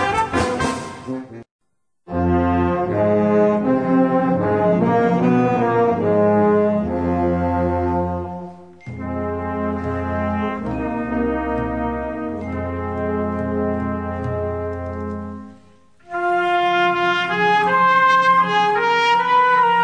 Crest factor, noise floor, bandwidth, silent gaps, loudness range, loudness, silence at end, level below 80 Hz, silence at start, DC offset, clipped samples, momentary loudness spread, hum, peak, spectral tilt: 14 dB; -52 dBFS; 10.5 kHz; 1.51-1.59 s; 8 LU; -19 LUFS; 0 s; -40 dBFS; 0 s; 0.2%; under 0.1%; 13 LU; none; -4 dBFS; -6.5 dB/octave